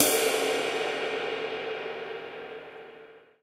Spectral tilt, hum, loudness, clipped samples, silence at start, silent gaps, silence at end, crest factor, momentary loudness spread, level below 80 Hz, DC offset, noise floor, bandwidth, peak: -1 dB/octave; none; -29 LUFS; under 0.1%; 0 s; none; 0.25 s; 28 dB; 20 LU; -72 dBFS; under 0.1%; -51 dBFS; 16 kHz; -4 dBFS